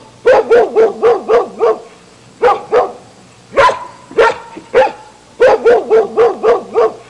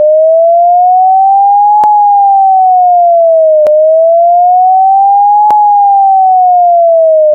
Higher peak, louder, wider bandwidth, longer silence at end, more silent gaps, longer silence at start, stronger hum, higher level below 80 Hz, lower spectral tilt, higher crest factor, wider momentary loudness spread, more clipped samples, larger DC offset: about the same, -2 dBFS vs -2 dBFS; second, -12 LUFS vs -5 LUFS; first, 10.5 kHz vs 3 kHz; first, 0.15 s vs 0 s; neither; first, 0.25 s vs 0 s; neither; first, -46 dBFS vs -64 dBFS; about the same, -4 dB/octave vs -3 dB/octave; first, 10 dB vs 4 dB; first, 8 LU vs 0 LU; neither; neither